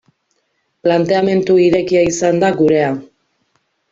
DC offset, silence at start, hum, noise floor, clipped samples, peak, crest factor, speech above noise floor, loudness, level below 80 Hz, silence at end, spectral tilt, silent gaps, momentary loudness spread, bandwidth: under 0.1%; 0.85 s; none; -66 dBFS; under 0.1%; -2 dBFS; 14 dB; 53 dB; -14 LUFS; -52 dBFS; 0.85 s; -5.5 dB/octave; none; 6 LU; 7.8 kHz